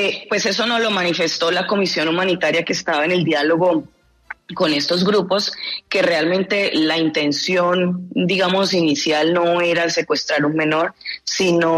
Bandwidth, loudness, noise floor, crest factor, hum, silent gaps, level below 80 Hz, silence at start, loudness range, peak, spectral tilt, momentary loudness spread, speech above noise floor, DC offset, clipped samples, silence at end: 13.5 kHz; -18 LUFS; -39 dBFS; 12 dB; none; none; -62 dBFS; 0 s; 1 LU; -6 dBFS; -4 dB/octave; 5 LU; 21 dB; under 0.1%; under 0.1%; 0 s